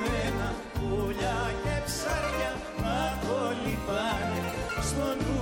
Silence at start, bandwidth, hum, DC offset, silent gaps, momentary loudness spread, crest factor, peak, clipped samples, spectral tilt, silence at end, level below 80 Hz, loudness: 0 s; 17 kHz; none; under 0.1%; none; 3 LU; 14 dB; -16 dBFS; under 0.1%; -5 dB/octave; 0 s; -40 dBFS; -30 LUFS